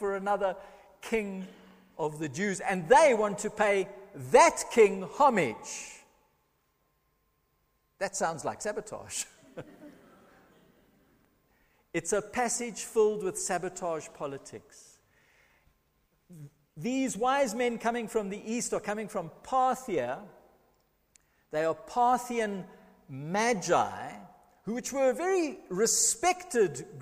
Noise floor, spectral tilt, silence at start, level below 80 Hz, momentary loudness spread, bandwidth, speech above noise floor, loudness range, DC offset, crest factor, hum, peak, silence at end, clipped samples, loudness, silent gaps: -74 dBFS; -3.5 dB/octave; 0 s; -64 dBFS; 18 LU; 15.5 kHz; 45 dB; 12 LU; under 0.1%; 24 dB; none; -6 dBFS; 0 s; under 0.1%; -29 LUFS; none